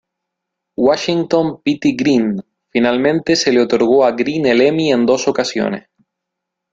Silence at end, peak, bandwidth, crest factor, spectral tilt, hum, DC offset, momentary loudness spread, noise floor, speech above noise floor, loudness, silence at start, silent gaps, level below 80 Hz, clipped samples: 0.9 s; 0 dBFS; 7.8 kHz; 16 dB; -5 dB/octave; none; under 0.1%; 8 LU; -79 dBFS; 65 dB; -15 LUFS; 0.8 s; none; -54 dBFS; under 0.1%